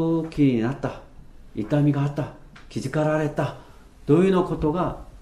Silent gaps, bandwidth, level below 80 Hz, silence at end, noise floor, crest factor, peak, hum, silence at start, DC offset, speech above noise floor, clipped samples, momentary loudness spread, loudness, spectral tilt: none; 11.5 kHz; -44 dBFS; 0 s; -44 dBFS; 18 dB; -6 dBFS; none; 0 s; under 0.1%; 21 dB; under 0.1%; 16 LU; -23 LUFS; -8 dB/octave